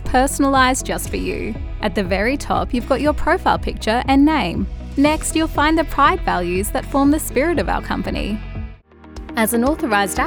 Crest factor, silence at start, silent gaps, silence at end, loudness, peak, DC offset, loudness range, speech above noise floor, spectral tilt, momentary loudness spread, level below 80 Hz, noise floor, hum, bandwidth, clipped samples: 16 dB; 0 s; none; 0 s; -18 LUFS; -2 dBFS; under 0.1%; 3 LU; 22 dB; -4.5 dB/octave; 10 LU; -28 dBFS; -39 dBFS; none; over 20 kHz; under 0.1%